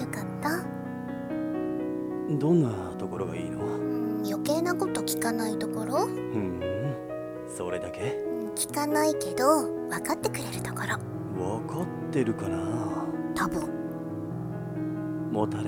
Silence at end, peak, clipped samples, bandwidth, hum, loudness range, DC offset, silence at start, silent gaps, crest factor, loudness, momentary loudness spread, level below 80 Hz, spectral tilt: 0 s; -10 dBFS; under 0.1%; 17.5 kHz; none; 3 LU; under 0.1%; 0 s; none; 20 dB; -30 LUFS; 9 LU; -58 dBFS; -5.5 dB/octave